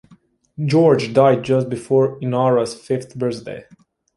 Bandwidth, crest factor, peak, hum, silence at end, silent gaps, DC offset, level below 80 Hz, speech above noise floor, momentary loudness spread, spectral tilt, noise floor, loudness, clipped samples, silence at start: 11.5 kHz; 18 dB; -2 dBFS; none; 0.55 s; none; under 0.1%; -58 dBFS; 36 dB; 12 LU; -7 dB/octave; -53 dBFS; -18 LUFS; under 0.1%; 0.6 s